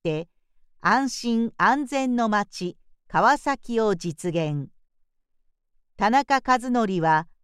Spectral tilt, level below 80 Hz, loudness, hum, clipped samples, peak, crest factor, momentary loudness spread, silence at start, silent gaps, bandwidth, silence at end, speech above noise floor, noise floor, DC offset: -5 dB/octave; -54 dBFS; -23 LUFS; none; under 0.1%; -6 dBFS; 18 dB; 11 LU; 0.05 s; none; 13 kHz; 0.2 s; 44 dB; -67 dBFS; under 0.1%